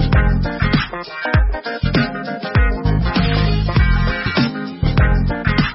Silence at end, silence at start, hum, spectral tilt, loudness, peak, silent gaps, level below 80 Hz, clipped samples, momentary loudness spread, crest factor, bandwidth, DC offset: 0 s; 0 s; none; -10.5 dB/octave; -18 LUFS; -2 dBFS; none; -20 dBFS; under 0.1%; 6 LU; 14 dB; 5.8 kHz; under 0.1%